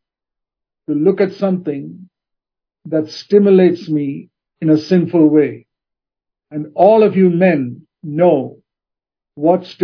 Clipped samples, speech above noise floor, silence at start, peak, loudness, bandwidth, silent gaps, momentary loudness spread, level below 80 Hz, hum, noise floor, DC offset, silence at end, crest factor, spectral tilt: under 0.1%; 74 dB; 0.9 s; 0 dBFS; -14 LUFS; 5.4 kHz; none; 17 LU; -70 dBFS; none; -87 dBFS; under 0.1%; 0 s; 16 dB; -9 dB/octave